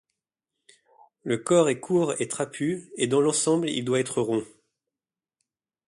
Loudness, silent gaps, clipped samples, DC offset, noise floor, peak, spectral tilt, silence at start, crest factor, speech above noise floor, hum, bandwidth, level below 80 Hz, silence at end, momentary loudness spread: -25 LUFS; none; under 0.1%; under 0.1%; under -90 dBFS; -8 dBFS; -4.5 dB/octave; 1.25 s; 18 dB; over 65 dB; none; 11.5 kHz; -70 dBFS; 1.4 s; 8 LU